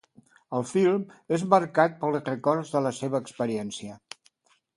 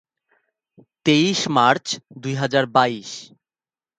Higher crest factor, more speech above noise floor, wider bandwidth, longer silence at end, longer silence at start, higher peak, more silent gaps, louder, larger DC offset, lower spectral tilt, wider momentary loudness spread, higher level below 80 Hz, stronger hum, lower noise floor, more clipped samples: about the same, 22 dB vs 22 dB; second, 39 dB vs over 70 dB; first, 11.5 kHz vs 9.4 kHz; about the same, 0.8 s vs 0.75 s; second, 0.5 s vs 1.05 s; second, -4 dBFS vs 0 dBFS; neither; second, -26 LUFS vs -19 LUFS; neither; first, -6 dB/octave vs -4.5 dB/octave; first, 17 LU vs 13 LU; about the same, -70 dBFS vs -66 dBFS; neither; second, -65 dBFS vs under -90 dBFS; neither